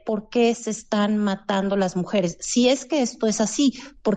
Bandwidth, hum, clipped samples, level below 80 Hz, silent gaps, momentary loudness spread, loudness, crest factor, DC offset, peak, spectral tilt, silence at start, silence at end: 9.4 kHz; none; under 0.1%; -56 dBFS; none; 5 LU; -22 LUFS; 14 dB; under 0.1%; -8 dBFS; -4.5 dB/octave; 0.05 s; 0 s